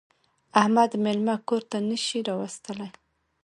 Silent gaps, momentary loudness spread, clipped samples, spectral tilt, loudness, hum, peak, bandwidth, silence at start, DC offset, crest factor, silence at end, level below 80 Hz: none; 15 LU; under 0.1%; -4.5 dB/octave; -25 LUFS; none; -4 dBFS; 11.5 kHz; 0.55 s; under 0.1%; 24 dB; 0.55 s; -72 dBFS